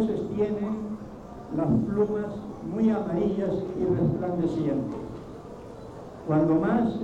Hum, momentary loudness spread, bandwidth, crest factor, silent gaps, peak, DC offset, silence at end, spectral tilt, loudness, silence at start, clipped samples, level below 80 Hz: none; 18 LU; 8.2 kHz; 14 dB; none; -12 dBFS; under 0.1%; 0 s; -9.5 dB/octave; -27 LUFS; 0 s; under 0.1%; -50 dBFS